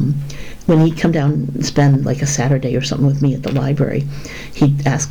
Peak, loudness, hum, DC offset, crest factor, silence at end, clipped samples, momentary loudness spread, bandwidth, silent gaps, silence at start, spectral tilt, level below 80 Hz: -4 dBFS; -16 LUFS; none; under 0.1%; 10 dB; 0 s; under 0.1%; 10 LU; 10 kHz; none; 0 s; -6 dB/octave; -38 dBFS